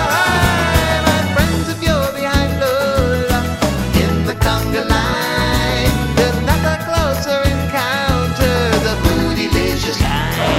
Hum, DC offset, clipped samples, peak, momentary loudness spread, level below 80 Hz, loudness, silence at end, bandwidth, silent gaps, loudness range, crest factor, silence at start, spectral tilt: none; under 0.1%; under 0.1%; 0 dBFS; 3 LU; -24 dBFS; -16 LUFS; 0 s; 16.5 kHz; none; 1 LU; 14 dB; 0 s; -5 dB/octave